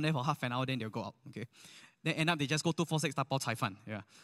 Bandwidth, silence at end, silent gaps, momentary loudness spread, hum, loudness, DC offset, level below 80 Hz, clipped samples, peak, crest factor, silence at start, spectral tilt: 15 kHz; 0 s; none; 15 LU; none; -35 LUFS; under 0.1%; -76 dBFS; under 0.1%; -12 dBFS; 22 dB; 0 s; -5 dB/octave